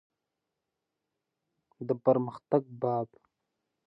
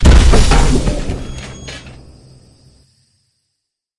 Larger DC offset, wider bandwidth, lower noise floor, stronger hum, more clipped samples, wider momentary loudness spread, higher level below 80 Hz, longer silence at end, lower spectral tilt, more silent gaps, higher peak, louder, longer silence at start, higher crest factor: neither; second, 5.6 kHz vs 11.5 kHz; first, -86 dBFS vs -75 dBFS; neither; neither; second, 12 LU vs 21 LU; second, -80 dBFS vs -16 dBFS; second, 0.8 s vs 2.1 s; first, -11 dB/octave vs -5 dB/octave; neither; second, -12 dBFS vs 0 dBFS; second, -30 LUFS vs -14 LUFS; first, 1.8 s vs 0 s; first, 22 dB vs 14 dB